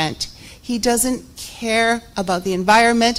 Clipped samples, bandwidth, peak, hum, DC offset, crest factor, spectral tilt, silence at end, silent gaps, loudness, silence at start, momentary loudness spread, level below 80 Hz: under 0.1%; 16 kHz; -2 dBFS; none; under 0.1%; 16 dB; -3 dB/octave; 0 s; none; -18 LUFS; 0 s; 15 LU; -44 dBFS